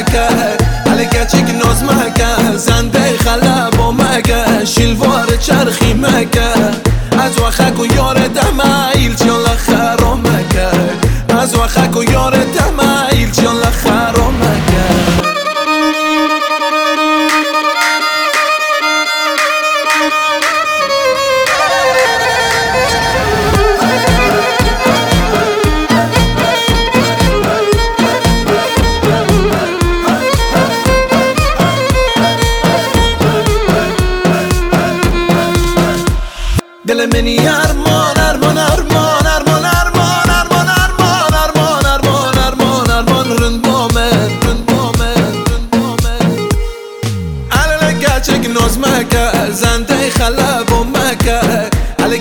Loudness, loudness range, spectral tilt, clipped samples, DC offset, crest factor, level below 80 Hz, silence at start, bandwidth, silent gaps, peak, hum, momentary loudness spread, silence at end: -11 LUFS; 2 LU; -4.5 dB/octave; under 0.1%; under 0.1%; 10 dB; -20 dBFS; 0 s; over 20 kHz; none; 0 dBFS; none; 3 LU; 0 s